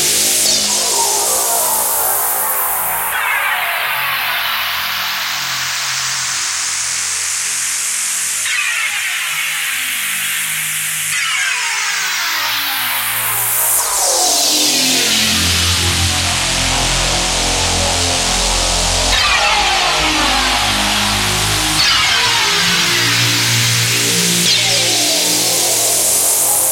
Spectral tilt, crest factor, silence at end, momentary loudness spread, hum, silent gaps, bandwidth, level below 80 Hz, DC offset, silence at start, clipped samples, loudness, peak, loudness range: -1 dB/octave; 16 dB; 0 s; 5 LU; none; none; 16.5 kHz; -32 dBFS; under 0.1%; 0 s; under 0.1%; -13 LUFS; 0 dBFS; 4 LU